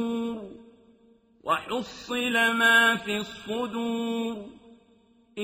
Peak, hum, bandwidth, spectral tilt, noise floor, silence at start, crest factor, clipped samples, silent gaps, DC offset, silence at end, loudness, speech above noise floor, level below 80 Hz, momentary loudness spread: -8 dBFS; none; 15.5 kHz; -3 dB/octave; -61 dBFS; 0 s; 20 dB; under 0.1%; none; under 0.1%; 0 s; -25 LUFS; 35 dB; -66 dBFS; 21 LU